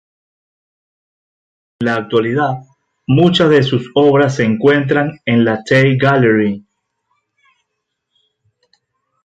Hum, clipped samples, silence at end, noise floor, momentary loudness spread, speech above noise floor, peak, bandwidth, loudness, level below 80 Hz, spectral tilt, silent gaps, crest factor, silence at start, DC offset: none; under 0.1%; 2.65 s; -74 dBFS; 9 LU; 62 dB; 0 dBFS; 8.6 kHz; -13 LUFS; -54 dBFS; -7 dB/octave; none; 14 dB; 1.8 s; under 0.1%